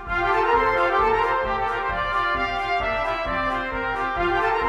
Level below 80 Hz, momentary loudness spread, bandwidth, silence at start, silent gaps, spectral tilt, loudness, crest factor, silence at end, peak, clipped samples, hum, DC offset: -38 dBFS; 5 LU; 15 kHz; 0 s; none; -5.5 dB/octave; -22 LUFS; 14 dB; 0 s; -8 dBFS; under 0.1%; none; under 0.1%